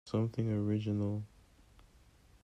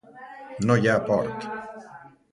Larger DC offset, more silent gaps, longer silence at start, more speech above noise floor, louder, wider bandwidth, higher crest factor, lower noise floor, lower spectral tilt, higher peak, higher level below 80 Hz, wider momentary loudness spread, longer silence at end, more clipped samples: neither; neither; about the same, 0.05 s vs 0.15 s; first, 29 dB vs 24 dB; second, -35 LUFS vs -24 LUFS; second, 8.2 kHz vs 11 kHz; about the same, 16 dB vs 20 dB; first, -63 dBFS vs -47 dBFS; first, -9 dB/octave vs -6.5 dB/octave; second, -20 dBFS vs -6 dBFS; second, -64 dBFS vs -58 dBFS; second, 8 LU vs 22 LU; first, 1.2 s vs 0.25 s; neither